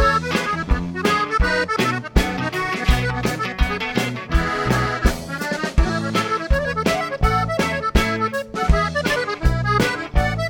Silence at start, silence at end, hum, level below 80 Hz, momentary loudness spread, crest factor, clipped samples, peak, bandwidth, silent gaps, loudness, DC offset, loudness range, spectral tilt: 0 s; 0 s; none; -24 dBFS; 4 LU; 18 dB; under 0.1%; 0 dBFS; 17.5 kHz; none; -21 LUFS; under 0.1%; 1 LU; -5 dB/octave